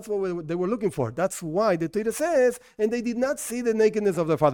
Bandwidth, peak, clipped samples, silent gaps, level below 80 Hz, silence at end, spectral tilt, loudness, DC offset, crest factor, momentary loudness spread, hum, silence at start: 17.5 kHz; -6 dBFS; under 0.1%; none; -58 dBFS; 0 s; -5.5 dB/octave; -25 LUFS; under 0.1%; 18 dB; 6 LU; none; 0 s